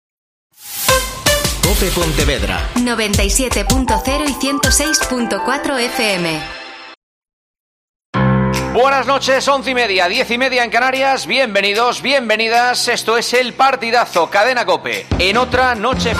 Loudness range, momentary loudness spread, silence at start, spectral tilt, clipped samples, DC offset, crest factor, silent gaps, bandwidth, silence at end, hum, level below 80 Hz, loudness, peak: 4 LU; 5 LU; 0.6 s; -3 dB/octave; under 0.1%; under 0.1%; 16 dB; 6.97-7.21 s, 7.33-7.54 s, 7.60-8.13 s; 15.5 kHz; 0 s; none; -28 dBFS; -14 LUFS; 0 dBFS